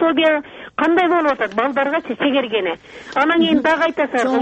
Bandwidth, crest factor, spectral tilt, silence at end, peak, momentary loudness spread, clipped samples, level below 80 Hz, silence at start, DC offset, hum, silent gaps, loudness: 8.4 kHz; 14 dB; -4.5 dB/octave; 0 s; -4 dBFS; 8 LU; under 0.1%; -56 dBFS; 0 s; under 0.1%; none; none; -17 LUFS